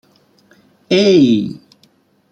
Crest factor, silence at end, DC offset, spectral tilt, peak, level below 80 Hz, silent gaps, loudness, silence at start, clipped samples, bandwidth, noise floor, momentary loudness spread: 16 dB; 0.75 s; under 0.1%; -6 dB/octave; -2 dBFS; -58 dBFS; none; -12 LUFS; 0.9 s; under 0.1%; 8.6 kHz; -55 dBFS; 17 LU